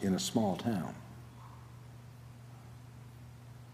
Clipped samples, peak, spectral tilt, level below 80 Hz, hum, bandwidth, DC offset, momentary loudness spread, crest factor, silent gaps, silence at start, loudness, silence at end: under 0.1%; -16 dBFS; -5.5 dB/octave; -66 dBFS; none; 15.5 kHz; under 0.1%; 20 LU; 22 dB; none; 0 s; -35 LUFS; 0 s